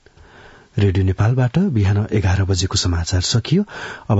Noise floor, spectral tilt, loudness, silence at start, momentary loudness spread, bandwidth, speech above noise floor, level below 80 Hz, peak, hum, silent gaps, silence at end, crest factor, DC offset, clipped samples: -45 dBFS; -5.5 dB/octave; -18 LUFS; 0.45 s; 3 LU; 8 kHz; 28 dB; -40 dBFS; -2 dBFS; none; none; 0 s; 16 dB; under 0.1%; under 0.1%